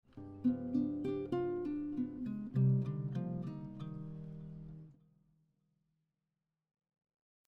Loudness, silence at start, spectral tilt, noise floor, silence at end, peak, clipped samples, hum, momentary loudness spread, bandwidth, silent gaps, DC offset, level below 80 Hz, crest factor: -38 LUFS; 0.15 s; -11 dB/octave; -90 dBFS; 2.55 s; -22 dBFS; under 0.1%; none; 17 LU; 4.6 kHz; none; under 0.1%; -68 dBFS; 18 dB